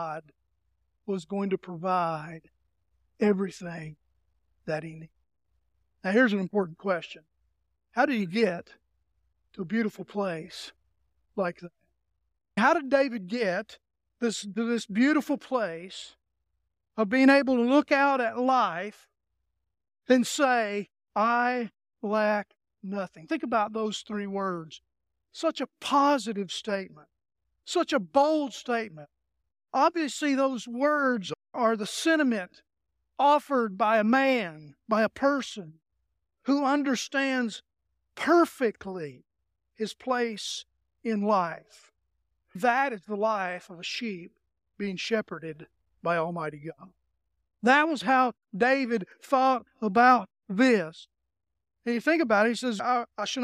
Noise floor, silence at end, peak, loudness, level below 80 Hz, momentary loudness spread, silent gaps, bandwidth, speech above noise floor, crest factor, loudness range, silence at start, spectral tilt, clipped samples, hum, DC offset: -82 dBFS; 0 s; -6 dBFS; -27 LUFS; -72 dBFS; 16 LU; none; 15 kHz; 55 dB; 22 dB; 7 LU; 0 s; -4.5 dB/octave; under 0.1%; none; under 0.1%